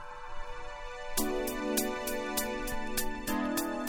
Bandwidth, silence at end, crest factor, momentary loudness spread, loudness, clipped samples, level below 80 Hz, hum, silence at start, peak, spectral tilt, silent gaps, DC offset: 19 kHz; 0 s; 20 dB; 12 LU; -34 LUFS; under 0.1%; -44 dBFS; none; 0 s; -14 dBFS; -2.5 dB/octave; none; under 0.1%